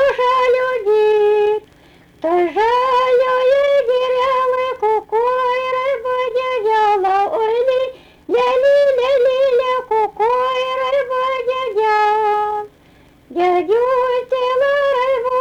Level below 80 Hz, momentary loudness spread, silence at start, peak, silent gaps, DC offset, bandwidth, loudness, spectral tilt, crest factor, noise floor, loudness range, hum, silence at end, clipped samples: -54 dBFS; 5 LU; 0 s; -6 dBFS; none; under 0.1%; 9.2 kHz; -16 LUFS; -4 dB/octave; 8 dB; -48 dBFS; 2 LU; none; 0 s; under 0.1%